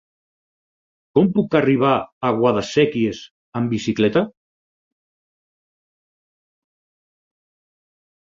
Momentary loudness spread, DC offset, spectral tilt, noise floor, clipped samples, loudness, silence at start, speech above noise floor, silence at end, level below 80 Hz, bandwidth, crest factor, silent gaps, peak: 8 LU; under 0.1%; -6.5 dB/octave; under -90 dBFS; under 0.1%; -19 LUFS; 1.15 s; over 72 dB; 4 s; -58 dBFS; 7.6 kHz; 20 dB; 2.12-2.21 s, 3.31-3.52 s; -2 dBFS